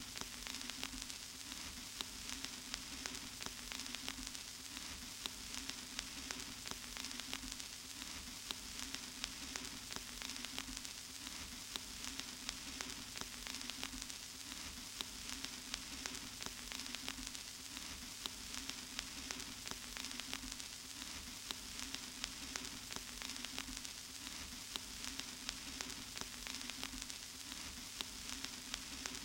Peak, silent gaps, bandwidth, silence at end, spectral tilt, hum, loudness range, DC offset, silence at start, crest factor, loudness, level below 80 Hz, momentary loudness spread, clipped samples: -16 dBFS; none; 17 kHz; 0 s; -1 dB/octave; none; 0 LU; under 0.1%; 0 s; 32 dB; -45 LUFS; -62 dBFS; 3 LU; under 0.1%